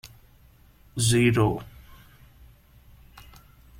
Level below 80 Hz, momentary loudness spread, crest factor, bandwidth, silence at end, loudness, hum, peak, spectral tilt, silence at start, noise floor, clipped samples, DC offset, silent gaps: -48 dBFS; 19 LU; 20 dB; 16 kHz; 2.1 s; -23 LUFS; none; -8 dBFS; -5 dB/octave; 0.05 s; -55 dBFS; under 0.1%; under 0.1%; none